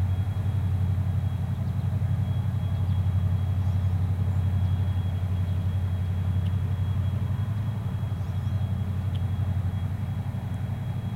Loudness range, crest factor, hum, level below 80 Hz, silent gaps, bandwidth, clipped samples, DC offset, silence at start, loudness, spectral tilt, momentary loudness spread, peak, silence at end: 3 LU; 10 dB; none; -42 dBFS; none; 4.4 kHz; under 0.1%; under 0.1%; 0 s; -28 LUFS; -8.5 dB/octave; 4 LU; -16 dBFS; 0 s